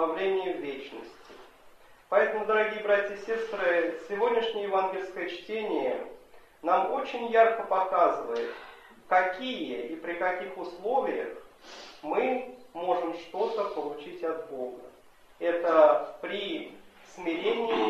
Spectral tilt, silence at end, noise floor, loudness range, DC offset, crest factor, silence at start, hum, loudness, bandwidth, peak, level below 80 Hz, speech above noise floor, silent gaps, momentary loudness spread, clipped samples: -4.5 dB/octave; 0 s; -54 dBFS; 5 LU; under 0.1%; 20 dB; 0 s; none; -29 LUFS; 13.5 kHz; -8 dBFS; -70 dBFS; 26 dB; none; 15 LU; under 0.1%